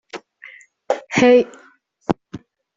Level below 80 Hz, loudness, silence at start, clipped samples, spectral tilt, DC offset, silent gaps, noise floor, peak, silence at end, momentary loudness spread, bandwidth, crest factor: -56 dBFS; -18 LUFS; 0.15 s; under 0.1%; -5 dB/octave; under 0.1%; none; -44 dBFS; 0 dBFS; 0.4 s; 25 LU; 7.8 kHz; 20 dB